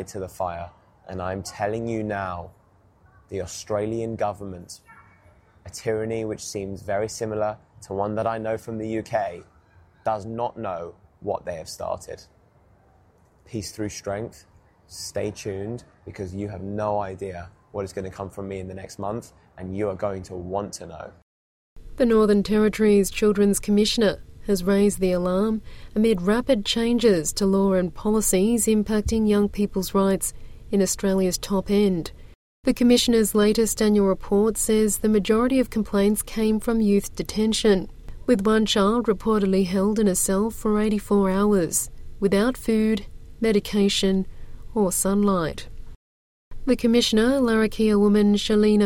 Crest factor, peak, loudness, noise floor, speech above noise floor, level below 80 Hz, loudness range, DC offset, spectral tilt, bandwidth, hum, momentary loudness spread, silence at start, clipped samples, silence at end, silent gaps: 16 dB; -6 dBFS; -23 LUFS; -58 dBFS; 35 dB; -42 dBFS; 11 LU; under 0.1%; -5 dB/octave; 16.5 kHz; none; 15 LU; 0 s; under 0.1%; 0 s; 21.22-21.76 s, 32.35-32.63 s, 45.95-46.51 s